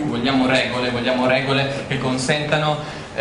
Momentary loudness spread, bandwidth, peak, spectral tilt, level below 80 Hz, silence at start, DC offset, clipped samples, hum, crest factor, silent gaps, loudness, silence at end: 6 LU; 10.5 kHz; -2 dBFS; -5 dB/octave; -46 dBFS; 0 s; under 0.1%; under 0.1%; none; 18 dB; none; -19 LUFS; 0 s